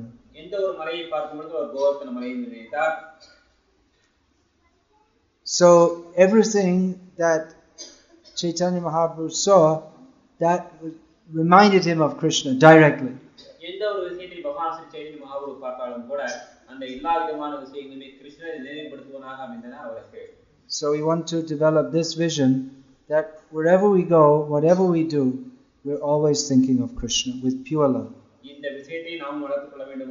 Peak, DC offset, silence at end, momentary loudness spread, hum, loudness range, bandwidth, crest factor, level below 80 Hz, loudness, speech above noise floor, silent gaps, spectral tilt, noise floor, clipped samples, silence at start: 0 dBFS; under 0.1%; 0 s; 21 LU; none; 13 LU; 7.4 kHz; 22 dB; -56 dBFS; -21 LUFS; 44 dB; none; -5 dB/octave; -65 dBFS; under 0.1%; 0 s